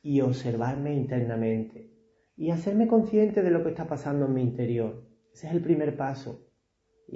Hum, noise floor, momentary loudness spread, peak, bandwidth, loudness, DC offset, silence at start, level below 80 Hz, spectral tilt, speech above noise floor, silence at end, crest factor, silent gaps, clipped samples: none; -72 dBFS; 13 LU; -12 dBFS; 8 kHz; -27 LUFS; under 0.1%; 0.05 s; -62 dBFS; -9 dB/octave; 46 dB; 0.8 s; 16 dB; none; under 0.1%